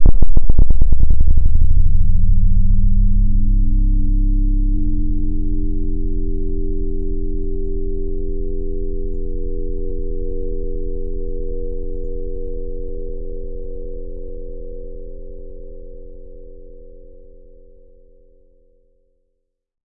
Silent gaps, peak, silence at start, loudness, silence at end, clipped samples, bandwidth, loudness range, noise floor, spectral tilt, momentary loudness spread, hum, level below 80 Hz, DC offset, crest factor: none; 0 dBFS; 0 s; -23 LUFS; 3.15 s; under 0.1%; 0.8 kHz; 19 LU; -70 dBFS; -15.5 dB/octave; 19 LU; none; -16 dBFS; under 0.1%; 12 dB